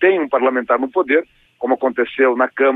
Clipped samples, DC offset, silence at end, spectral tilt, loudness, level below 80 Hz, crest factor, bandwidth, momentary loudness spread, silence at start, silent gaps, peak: under 0.1%; under 0.1%; 0 s; -7 dB/octave; -17 LUFS; -62 dBFS; 16 dB; 4 kHz; 4 LU; 0 s; none; -2 dBFS